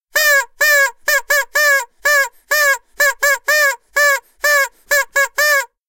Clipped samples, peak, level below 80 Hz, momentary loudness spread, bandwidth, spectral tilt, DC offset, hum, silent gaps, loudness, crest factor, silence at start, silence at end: under 0.1%; 0 dBFS; -58 dBFS; 4 LU; 17 kHz; 3.5 dB/octave; under 0.1%; none; none; -14 LUFS; 16 dB; 0.15 s; 0.25 s